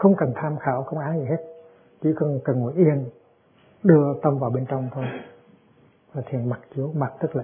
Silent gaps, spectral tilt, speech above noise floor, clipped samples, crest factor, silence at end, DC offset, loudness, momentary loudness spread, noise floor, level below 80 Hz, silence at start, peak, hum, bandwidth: none; -13.5 dB/octave; 35 dB; under 0.1%; 22 dB; 0 s; under 0.1%; -24 LUFS; 13 LU; -57 dBFS; -66 dBFS; 0 s; -2 dBFS; none; 3.5 kHz